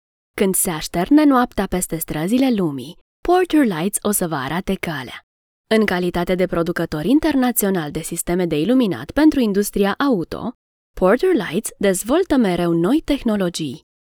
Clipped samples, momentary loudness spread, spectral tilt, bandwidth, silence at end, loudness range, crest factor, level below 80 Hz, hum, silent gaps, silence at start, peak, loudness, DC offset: under 0.1%; 10 LU; -5 dB/octave; over 20 kHz; 0.4 s; 2 LU; 16 dB; -42 dBFS; none; 3.01-3.23 s, 5.23-5.64 s, 10.55-10.94 s; 0.35 s; -2 dBFS; -19 LUFS; under 0.1%